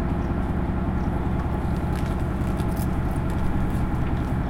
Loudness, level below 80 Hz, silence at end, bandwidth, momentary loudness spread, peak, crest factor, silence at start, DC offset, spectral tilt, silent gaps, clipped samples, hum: -26 LUFS; -28 dBFS; 0 s; 16.5 kHz; 1 LU; -12 dBFS; 12 dB; 0 s; under 0.1%; -8 dB/octave; none; under 0.1%; none